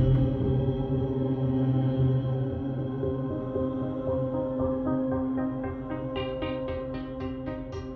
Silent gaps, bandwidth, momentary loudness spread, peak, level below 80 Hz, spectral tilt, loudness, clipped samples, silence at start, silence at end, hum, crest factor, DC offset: none; 4.4 kHz; 9 LU; -12 dBFS; -42 dBFS; -10.5 dB/octave; -29 LUFS; under 0.1%; 0 s; 0 s; none; 16 dB; under 0.1%